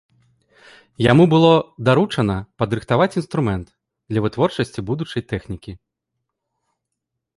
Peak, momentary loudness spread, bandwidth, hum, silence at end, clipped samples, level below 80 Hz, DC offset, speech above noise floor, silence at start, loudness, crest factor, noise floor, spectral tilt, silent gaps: -2 dBFS; 15 LU; 11.5 kHz; none; 1.6 s; under 0.1%; -46 dBFS; under 0.1%; 62 dB; 1 s; -19 LUFS; 18 dB; -80 dBFS; -7.5 dB/octave; none